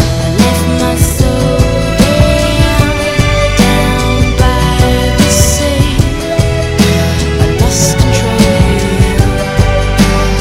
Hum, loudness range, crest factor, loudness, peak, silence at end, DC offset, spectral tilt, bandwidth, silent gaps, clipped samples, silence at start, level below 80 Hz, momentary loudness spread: none; 1 LU; 10 dB; -10 LUFS; 0 dBFS; 0 s; 2%; -5 dB/octave; 16.5 kHz; none; 2%; 0 s; -16 dBFS; 3 LU